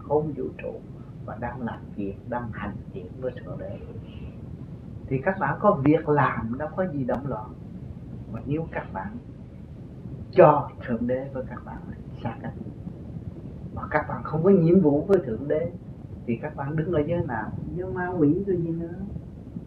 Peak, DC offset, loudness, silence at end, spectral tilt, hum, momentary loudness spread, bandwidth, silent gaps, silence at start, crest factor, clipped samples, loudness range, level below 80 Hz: -2 dBFS; under 0.1%; -26 LUFS; 0 s; -10.5 dB/octave; none; 19 LU; 5.2 kHz; none; 0 s; 24 dB; under 0.1%; 10 LU; -46 dBFS